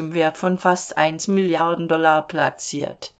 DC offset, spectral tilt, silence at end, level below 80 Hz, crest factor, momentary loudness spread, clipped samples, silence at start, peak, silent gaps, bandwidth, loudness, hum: under 0.1%; -4.5 dB/octave; 0.1 s; -64 dBFS; 18 dB; 6 LU; under 0.1%; 0 s; -2 dBFS; none; 9.2 kHz; -19 LUFS; none